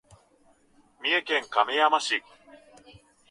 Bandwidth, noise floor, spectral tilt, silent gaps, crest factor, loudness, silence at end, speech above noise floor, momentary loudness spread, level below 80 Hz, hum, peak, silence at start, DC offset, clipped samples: 11.5 kHz; -62 dBFS; -1 dB/octave; none; 22 dB; -25 LUFS; 0.75 s; 37 dB; 7 LU; -72 dBFS; none; -8 dBFS; 1 s; under 0.1%; under 0.1%